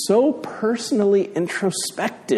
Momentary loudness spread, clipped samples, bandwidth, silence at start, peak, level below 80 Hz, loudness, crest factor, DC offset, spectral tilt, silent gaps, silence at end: 7 LU; under 0.1%; 13.5 kHz; 0 s; -6 dBFS; -68 dBFS; -21 LUFS; 14 dB; under 0.1%; -4.5 dB/octave; none; 0 s